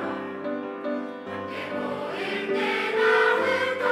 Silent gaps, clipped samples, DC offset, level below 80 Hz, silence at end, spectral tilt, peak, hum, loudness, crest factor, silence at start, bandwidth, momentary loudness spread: none; under 0.1%; under 0.1%; -82 dBFS; 0 s; -4.5 dB/octave; -10 dBFS; none; -26 LUFS; 16 dB; 0 s; 14.5 kHz; 12 LU